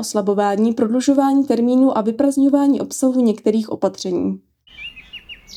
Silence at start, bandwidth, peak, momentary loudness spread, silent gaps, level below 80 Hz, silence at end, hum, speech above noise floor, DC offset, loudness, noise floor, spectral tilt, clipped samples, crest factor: 0 s; 13.5 kHz; -2 dBFS; 18 LU; none; -58 dBFS; 0 s; none; 22 dB; under 0.1%; -17 LUFS; -38 dBFS; -5.5 dB/octave; under 0.1%; 14 dB